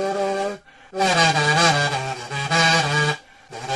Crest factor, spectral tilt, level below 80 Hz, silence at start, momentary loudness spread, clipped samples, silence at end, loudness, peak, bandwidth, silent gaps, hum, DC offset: 18 dB; -3.5 dB/octave; -56 dBFS; 0 s; 18 LU; under 0.1%; 0 s; -19 LUFS; -4 dBFS; 11.5 kHz; none; none; under 0.1%